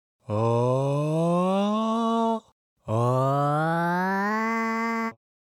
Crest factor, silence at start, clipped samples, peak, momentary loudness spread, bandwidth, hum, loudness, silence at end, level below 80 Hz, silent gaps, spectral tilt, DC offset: 14 dB; 0.3 s; under 0.1%; -12 dBFS; 7 LU; 16 kHz; none; -25 LUFS; 0.3 s; -68 dBFS; 2.52-2.76 s; -7.5 dB/octave; under 0.1%